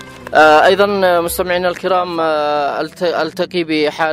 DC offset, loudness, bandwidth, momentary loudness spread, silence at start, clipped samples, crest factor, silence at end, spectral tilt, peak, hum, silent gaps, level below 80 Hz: under 0.1%; -14 LUFS; 16 kHz; 10 LU; 0 s; under 0.1%; 14 dB; 0 s; -4 dB/octave; 0 dBFS; none; none; -46 dBFS